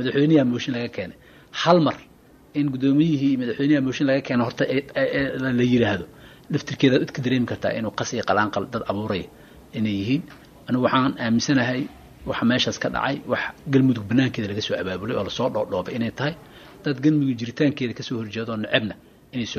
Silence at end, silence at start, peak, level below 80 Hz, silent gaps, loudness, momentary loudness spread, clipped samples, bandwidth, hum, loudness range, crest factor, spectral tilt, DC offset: 0 s; 0 s; -4 dBFS; -54 dBFS; none; -23 LUFS; 11 LU; under 0.1%; 13.5 kHz; none; 3 LU; 20 dB; -6 dB/octave; under 0.1%